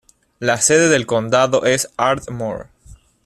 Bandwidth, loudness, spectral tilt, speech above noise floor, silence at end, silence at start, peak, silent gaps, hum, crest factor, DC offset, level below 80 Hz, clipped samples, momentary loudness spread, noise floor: 14.5 kHz; -16 LUFS; -3.5 dB/octave; 29 dB; 0.3 s; 0.4 s; 0 dBFS; none; none; 16 dB; under 0.1%; -50 dBFS; under 0.1%; 13 LU; -45 dBFS